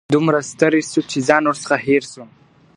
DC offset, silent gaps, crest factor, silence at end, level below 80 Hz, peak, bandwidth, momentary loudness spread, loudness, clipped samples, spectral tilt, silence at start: under 0.1%; none; 18 dB; 0.5 s; -60 dBFS; 0 dBFS; 11 kHz; 4 LU; -17 LUFS; under 0.1%; -5 dB/octave; 0.1 s